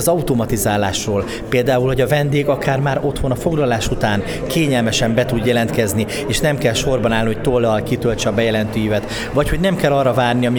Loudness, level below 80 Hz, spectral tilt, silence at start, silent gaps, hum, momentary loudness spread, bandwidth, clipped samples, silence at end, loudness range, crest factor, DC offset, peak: -17 LUFS; -32 dBFS; -5 dB/octave; 0 s; none; none; 4 LU; over 20 kHz; under 0.1%; 0 s; 1 LU; 14 dB; under 0.1%; -2 dBFS